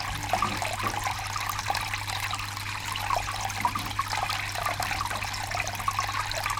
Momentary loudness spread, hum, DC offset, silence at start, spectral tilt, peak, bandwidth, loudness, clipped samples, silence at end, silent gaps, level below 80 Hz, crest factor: 3 LU; none; under 0.1%; 0 s; -2.5 dB/octave; -10 dBFS; 19 kHz; -29 LUFS; under 0.1%; 0 s; none; -46 dBFS; 20 dB